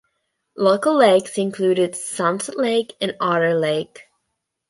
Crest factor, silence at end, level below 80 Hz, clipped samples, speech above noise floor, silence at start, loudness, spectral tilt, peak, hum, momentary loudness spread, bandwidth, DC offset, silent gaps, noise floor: 18 dB; 0.65 s; -70 dBFS; under 0.1%; 58 dB; 0.55 s; -19 LUFS; -4.5 dB/octave; -2 dBFS; none; 9 LU; 11.5 kHz; under 0.1%; none; -77 dBFS